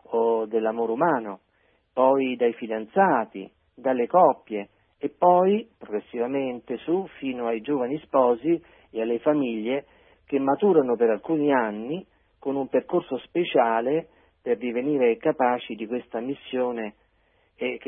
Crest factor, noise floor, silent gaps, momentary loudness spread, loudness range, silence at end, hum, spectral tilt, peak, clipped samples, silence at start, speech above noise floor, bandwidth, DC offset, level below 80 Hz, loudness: 20 dB; -65 dBFS; none; 13 LU; 3 LU; 0.05 s; none; -10.5 dB/octave; -6 dBFS; under 0.1%; 0.1 s; 42 dB; 3.7 kHz; under 0.1%; -68 dBFS; -25 LUFS